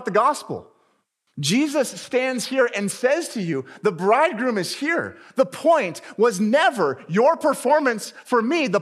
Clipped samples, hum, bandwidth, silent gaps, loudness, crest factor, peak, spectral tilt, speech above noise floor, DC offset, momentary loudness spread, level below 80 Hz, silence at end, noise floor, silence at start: under 0.1%; none; 15 kHz; none; -21 LUFS; 16 dB; -6 dBFS; -4.5 dB/octave; 47 dB; under 0.1%; 8 LU; -82 dBFS; 0 s; -68 dBFS; 0 s